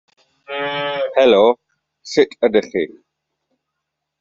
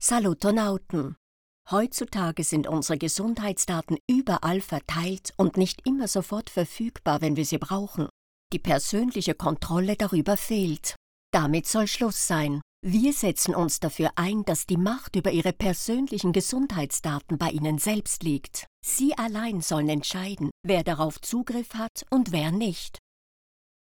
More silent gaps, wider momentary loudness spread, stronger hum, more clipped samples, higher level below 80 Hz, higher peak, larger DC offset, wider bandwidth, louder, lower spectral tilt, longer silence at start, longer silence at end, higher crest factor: second, none vs 1.17-1.65 s, 4.00-4.08 s, 8.10-8.50 s, 10.96-11.33 s, 12.62-12.83 s, 18.67-18.83 s, 20.51-20.64 s, 21.89-21.95 s; first, 14 LU vs 7 LU; neither; neither; second, -60 dBFS vs -48 dBFS; first, -2 dBFS vs -10 dBFS; neither; second, 7.6 kHz vs over 20 kHz; first, -17 LUFS vs -26 LUFS; second, -2.5 dB/octave vs -4.5 dB/octave; first, 0.5 s vs 0 s; first, 1.35 s vs 1 s; about the same, 18 dB vs 18 dB